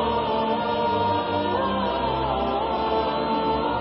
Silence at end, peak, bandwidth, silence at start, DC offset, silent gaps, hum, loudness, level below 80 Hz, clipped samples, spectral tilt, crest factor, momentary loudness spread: 0 s; -12 dBFS; 5.8 kHz; 0 s; under 0.1%; none; none; -24 LUFS; -42 dBFS; under 0.1%; -10.5 dB/octave; 12 dB; 1 LU